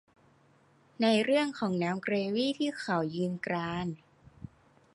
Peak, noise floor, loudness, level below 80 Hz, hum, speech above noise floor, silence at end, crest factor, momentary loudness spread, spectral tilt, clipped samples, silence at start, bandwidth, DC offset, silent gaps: -14 dBFS; -64 dBFS; -31 LUFS; -66 dBFS; none; 34 dB; 0.5 s; 18 dB; 22 LU; -6 dB/octave; under 0.1%; 1 s; 11.5 kHz; under 0.1%; none